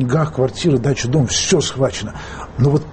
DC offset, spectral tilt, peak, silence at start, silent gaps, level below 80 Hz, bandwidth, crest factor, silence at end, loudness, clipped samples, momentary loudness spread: under 0.1%; -5 dB/octave; -4 dBFS; 0 s; none; -38 dBFS; 8.8 kHz; 14 dB; 0 s; -17 LUFS; under 0.1%; 12 LU